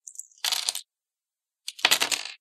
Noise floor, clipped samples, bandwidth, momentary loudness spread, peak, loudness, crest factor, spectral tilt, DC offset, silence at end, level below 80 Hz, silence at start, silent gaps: under -90 dBFS; under 0.1%; 16.5 kHz; 19 LU; -4 dBFS; -24 LUFS; 26 dB; 2 dB/octave; under 0.1%; 0.05 s; -80 dBFS; 0.2 s; none